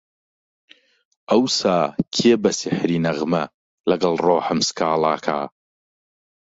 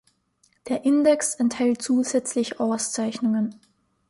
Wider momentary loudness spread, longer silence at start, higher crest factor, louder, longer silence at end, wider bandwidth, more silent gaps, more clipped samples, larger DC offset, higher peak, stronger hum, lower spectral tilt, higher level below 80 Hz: about the same, 8 LU vs 7 LU; first, 1.3 s vs 0.65 s; about the same, 18 dB vs 16 dB; first, -20 LUFS vs -23 LUFS; first, 1.1 s vs 0.55 s; second, 8 kHz vs 11.5 kHz; first, 3.54-3.84 s vs none; neither; neither; first, -4 dBFS vs -8 dBFS; neither; about the same, -4.5 dB/octave vs -4 dB/octave; first, -60 dBFS vs -68 dBFS